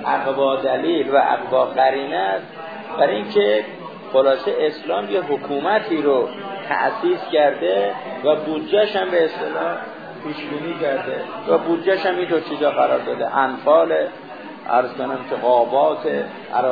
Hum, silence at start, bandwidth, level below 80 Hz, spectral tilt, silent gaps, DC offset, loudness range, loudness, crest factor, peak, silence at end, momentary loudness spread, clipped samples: none; 0 s; 5 kHz; -72 dBFS; -7.5 dB/octave; none; 0.1%; 3 LU; -20 LUFS; 16 dB; -4 dBFS; 0 s; 10 LU; under 0.1%